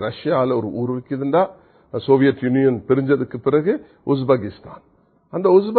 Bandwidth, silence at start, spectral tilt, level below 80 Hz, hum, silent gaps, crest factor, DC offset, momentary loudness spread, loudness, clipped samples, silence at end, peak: 4.5 kHz; 0 s; -12.5 dB/octave; -56 dBFS; none; none; 18 dB; under 0.1%; 9 LU; -19 LUFS; under 0.1%; 0 s; -2 dBFS